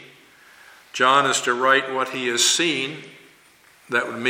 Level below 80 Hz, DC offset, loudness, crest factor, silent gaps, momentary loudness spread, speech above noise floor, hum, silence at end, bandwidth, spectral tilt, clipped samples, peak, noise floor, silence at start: -76 dBFS; under 0.1%; -19 LUFS; 20 dB; none; 10 LU; 33 dB; none; 0 s; 17 kHz; -1.5 dB/octave; under 0.1%; -2 dBFS; -54 dBFS; 0 s